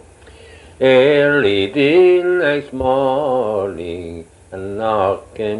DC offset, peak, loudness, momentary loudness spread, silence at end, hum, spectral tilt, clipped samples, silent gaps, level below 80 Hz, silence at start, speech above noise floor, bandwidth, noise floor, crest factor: under 0.1%; 0 dBFS; -15 LUFS; 17 LU; 0 s; none; -6.5 dB/octave; under 0.1%; none; -46 dBFS; 0.55 s; 27 dB; 11 kHz; -42 dBFS; 16 dB